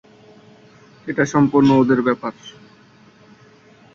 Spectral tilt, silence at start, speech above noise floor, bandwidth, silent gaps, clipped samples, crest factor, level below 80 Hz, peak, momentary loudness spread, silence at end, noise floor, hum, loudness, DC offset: -7 dB/octave; 1.05 s; 33 dB; 7.2 kHz; none; under 0.1%; 18 dB; -56 dBFS; -2 dBFS; 23 LU; 1.45 s; -49 dBFS; none; -17 LUFS; under 0.1%